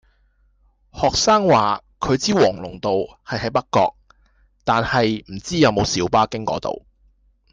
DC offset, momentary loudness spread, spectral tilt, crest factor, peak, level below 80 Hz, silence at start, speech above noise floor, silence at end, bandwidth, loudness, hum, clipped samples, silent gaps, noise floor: under 0.1%; 11 LU; -4.5 dB/octave; 16 dB; -4 dBFS; -44 dBFS; 0.95 s; 41 dB; 0.75 s; 10 kHz; -19 LUFS; none; under 0.1%; none; -60 dBFS